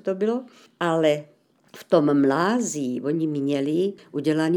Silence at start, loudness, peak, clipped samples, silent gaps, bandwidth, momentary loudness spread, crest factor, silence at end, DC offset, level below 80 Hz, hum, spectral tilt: 0.05 s; -23 LUFS; -4 dBFS; under 0.1%; none; 17.5 kHz; 8 LU; 18 dB; 0 s; under 0.1%; -78 dBFS; none; -5.5 dB/octave